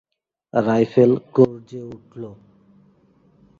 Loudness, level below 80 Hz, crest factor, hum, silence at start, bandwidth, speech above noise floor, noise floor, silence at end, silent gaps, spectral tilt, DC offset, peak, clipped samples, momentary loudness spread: -18 LUFS; -62 dBFS; 20 dB; none; 0.55 s; 7.2 kHz; 38 dB; -57 dBFS; 1.25 s; none; -9 dB/octave; under 0.1%; -2 dBFS; under 0.1%; 21 LU